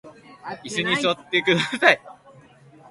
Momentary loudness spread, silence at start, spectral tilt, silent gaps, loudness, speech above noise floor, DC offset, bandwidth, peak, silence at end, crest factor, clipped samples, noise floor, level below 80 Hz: 18 LU; 0.05 s; -4 dB/octave; none; -20 LUFS; 29 dB; under 0.1%; 11.5 kHz; 0 dBFS; 0.8 s; 24 dB; under 0.1%; -50 dBFS; -64 dBFS